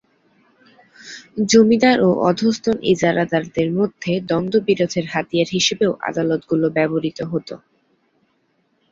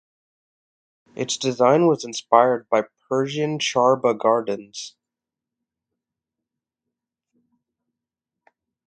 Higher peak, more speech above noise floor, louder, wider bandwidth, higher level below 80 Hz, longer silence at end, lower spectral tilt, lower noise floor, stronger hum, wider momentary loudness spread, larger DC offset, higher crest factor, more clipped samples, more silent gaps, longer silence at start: about the same, -2 dBFS vs 0 dBFS; second, 47 dB vs 67 dB; about the same, -18 LUFS vs -20 LUFS; second, 7.8 kHz vs 9.4 kHz; first, -56 dBFS vs -72 dBFS; second, 1.35 s vs 4 s; about the same, -5 dB/octave vs -4.5 dB/octave; second, -65 dBFS vs -87 dBFS; neither; about the same, 12 LU vs 14 LU; neither; second, 18 dB vs 24 dB; neither; neither; about the same, 1.05 s vs 1.15 s